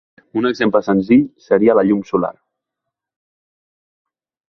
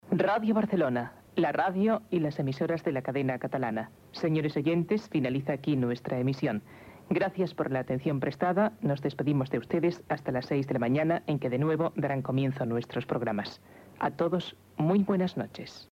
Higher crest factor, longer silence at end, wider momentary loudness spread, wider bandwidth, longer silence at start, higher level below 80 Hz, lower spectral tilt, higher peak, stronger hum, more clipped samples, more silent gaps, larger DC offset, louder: about the same, 16 dB vs 16 dB; first, 2.2 s vs 0.1 s; about the same, 7 LU vs 7 LU; second, 6.4 kHz vs 15.5 kHz; first, 0.35 s vs 0.05 s; first, -54 dBFS vs -66 dBFS; about the same, -8 dB/octave vs -8.5 dB/octave; first, -2 dBFS vs -14 dBFS; neither; neither; neither; neither; first, -16 LUFS vs -30 LUFS